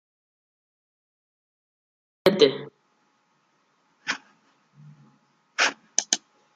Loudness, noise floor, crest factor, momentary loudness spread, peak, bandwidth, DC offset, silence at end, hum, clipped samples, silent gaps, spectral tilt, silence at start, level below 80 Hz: -24 LUFS; -68 dBFS; 28 dB; 17 LU; -2 dBFS; 13 kHz; under 0.1%; 0.4 s; none; under 0.1%; none; -2 dB/octave; 2.25 s; -74 dBFS